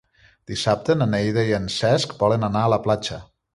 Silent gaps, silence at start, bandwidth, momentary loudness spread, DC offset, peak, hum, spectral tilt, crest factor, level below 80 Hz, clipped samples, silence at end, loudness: none; 0.5 s; 11.5 kHz; 6 LU; under 0.1%; -4 dBFS; none; -5.5 dB/octave; 18 dB; -48 dBFS; under 0.1%; 0.3 s; -21 LUFS